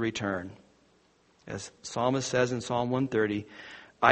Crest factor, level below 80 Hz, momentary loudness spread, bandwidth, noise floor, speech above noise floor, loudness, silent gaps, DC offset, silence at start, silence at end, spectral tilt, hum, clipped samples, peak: 28 dB; -64 dBFS; 18 LU; 8.4 kHz; -65 dBFS; 35 dB; -30 LUFS; none; under 0.1%; 0 s; 0 s; -5 dB/octave; none; under 0.1%; -2 dBFS